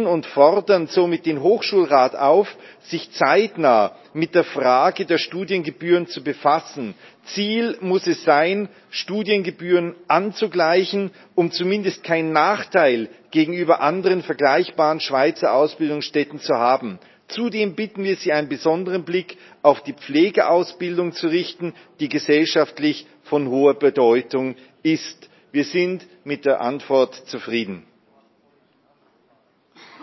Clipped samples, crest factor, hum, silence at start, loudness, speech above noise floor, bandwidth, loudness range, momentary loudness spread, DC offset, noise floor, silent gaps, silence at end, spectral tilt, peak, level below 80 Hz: under 0.1%; 20 dB; none; 0 s; -20 LUFS; 41 dB; 6.2 kHz; 4 LU; 10 LU; under 0.1%; -61 dBFS; none; 2.25 s; -5.5 dB/octave; 0 dBFS; -74 dBFS